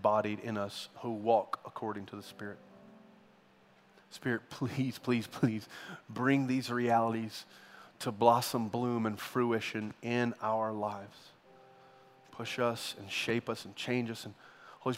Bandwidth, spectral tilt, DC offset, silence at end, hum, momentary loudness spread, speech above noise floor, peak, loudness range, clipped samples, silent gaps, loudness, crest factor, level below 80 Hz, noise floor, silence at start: 16 kHz; -5.5 dB/octave; under 0.1%; 0 s; none; 17 LU; 30 dB; -10 dBFS; 7 LU; under 0.1%; none; -34 LUFS; 24 dB; -78 dBFS; -64 dBFS; 0 s